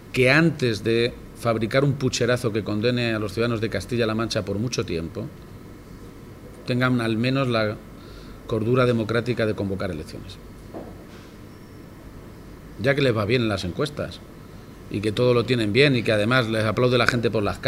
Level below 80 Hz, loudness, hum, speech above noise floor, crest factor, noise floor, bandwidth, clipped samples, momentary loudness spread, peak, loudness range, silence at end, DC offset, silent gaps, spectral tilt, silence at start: -48 dBFS; -22 LUFS; none; 20 dB; 24 dB; -42 dBFS; 16 kHz; under 0.1%; 23 LU; 0 dBFS; 7 LU; 0 s; under 0.1%; none; -6 dB/octave; 0 s